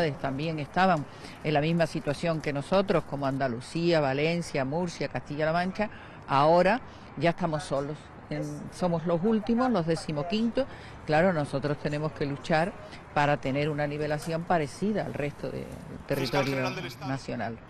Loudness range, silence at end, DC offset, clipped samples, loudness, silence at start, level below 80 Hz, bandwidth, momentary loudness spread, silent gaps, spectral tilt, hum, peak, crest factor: 2 LU; 0 s; under 0.1%; under 0.1%; -28 LUFS; 0 s; -52 dBFS; 13.5 kHz; 10 LU; none; -6.5 dB/octave; none; -12 dBFS; 16 dB